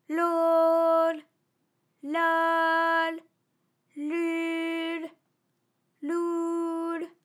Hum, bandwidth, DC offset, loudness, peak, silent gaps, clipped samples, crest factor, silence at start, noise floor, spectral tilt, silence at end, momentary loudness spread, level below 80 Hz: none; 13 kHz; under 0.1%; -26 LUFS; -14 dBFS; none; under 0.1%; 14 dB; 0.1 s; -76 dBFS; -3 dB/octave; 0.15 s; 15 LU; under -90 dBFS